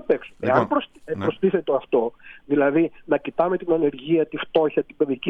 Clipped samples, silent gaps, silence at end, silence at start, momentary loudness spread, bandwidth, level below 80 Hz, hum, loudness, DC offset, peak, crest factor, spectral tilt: under 0.1%; none; 0 s; 0.1 s; 5 LU; 5.8 kHz; -58 dBFS; none; -23 LUFS; under 0.1%; -2 dBFS; 20 dB; -8.5 dB/octave